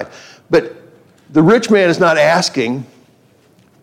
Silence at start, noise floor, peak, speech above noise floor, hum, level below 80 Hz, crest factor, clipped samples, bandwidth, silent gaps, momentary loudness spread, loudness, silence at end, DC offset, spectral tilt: 0 s; -51 dBFS; -2 dBFS; 39 dB; none; -56 dBFS; 14 dB; under 0.1%; 15.5 kHz; none; 14 LU; -13 LUFS; 1 s; under 0.1%; -5 dB/octave